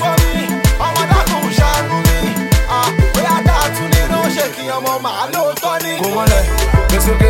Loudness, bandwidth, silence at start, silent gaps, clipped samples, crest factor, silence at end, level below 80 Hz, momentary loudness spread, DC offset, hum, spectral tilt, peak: -14 LUFS; 17 kHz; 0 s; none; under 0.1%; 14 dB; 0 s; -18 dBFS; 5 LU; under 0.1%; none; -4.5 dB/octave; 0 dBFS